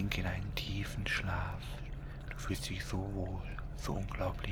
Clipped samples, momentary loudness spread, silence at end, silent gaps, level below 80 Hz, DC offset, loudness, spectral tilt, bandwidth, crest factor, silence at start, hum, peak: under 0.1%; 10 LU; 0 s; none; -44 dBFS; under 0.1%; -39 LUFS; -5 dB/octave; 19 kHz; 22 dB; 0 s; none; -16 dBFS